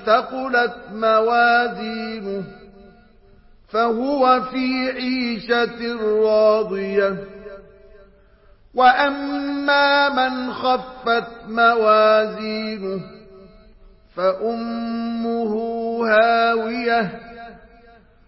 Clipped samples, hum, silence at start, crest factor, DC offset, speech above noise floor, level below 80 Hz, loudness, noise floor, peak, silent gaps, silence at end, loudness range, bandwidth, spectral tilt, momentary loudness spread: under 0.1%; none; 0 s; 16 dB; under 0.1%; 32 dB; -54 dBFS; -19 LUFS; -51 dBFS; -4 dBFS; none; 0.7 s; 5 LU; 5.8 kHz; -8.5 dB/octave; 13 LU